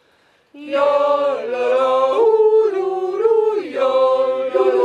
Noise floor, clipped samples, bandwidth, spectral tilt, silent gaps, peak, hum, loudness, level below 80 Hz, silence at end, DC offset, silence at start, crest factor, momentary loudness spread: -57 dBFS; under 0.1%; 9 kHz; -4.5 dB/octave; none; -4 dBFS; none; -17 LUFS; -68 dBFS; 0 s; under 0.1%; 0.55 s; 12 dB; 7 LU